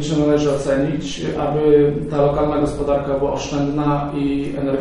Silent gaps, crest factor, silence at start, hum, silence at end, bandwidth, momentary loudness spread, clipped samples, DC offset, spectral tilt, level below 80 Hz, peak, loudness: none; 14 dB; 0 s; none; 0 s; 11 kHz; 7 LU; under 0.1%; under 0.1%; -7 dB/octave; -36 dBFS; -4 dBFS; -19 LUFS